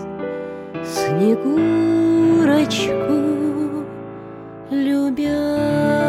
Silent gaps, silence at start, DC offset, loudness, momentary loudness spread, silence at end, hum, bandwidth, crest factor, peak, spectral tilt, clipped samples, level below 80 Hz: none; 0 s; under 0.1%; -18 LUFS; 15 LU; 0 s; none; 14 kHz; 14 dB; -4 dBFS; -6 dB/octave; under 0.1%; -52 dBFS